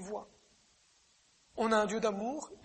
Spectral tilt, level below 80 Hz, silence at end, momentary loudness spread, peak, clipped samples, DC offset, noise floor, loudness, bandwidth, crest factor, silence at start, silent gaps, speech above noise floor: -4.5 dB/octave; -70 dBFS; 0.1 s; 15 LU; -16 dBFS; under 0.1%; under 0.1%; -69 dBFS; -33 LUFS; 8.4 kHz; 20 dB; 0 s; none; 36 dB